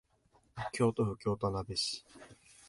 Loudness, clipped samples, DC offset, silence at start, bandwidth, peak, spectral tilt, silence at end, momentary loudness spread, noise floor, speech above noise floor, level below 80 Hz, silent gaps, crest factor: -35 LUFS; under 0.1%; under 0.1%; 0.55 s; 11.5 kHz; -18 dBFS; -5 dB/octave; 0.35 s; 13 LU; -70 dBFS; 35 dB; -58 dBFS; none; 20 dB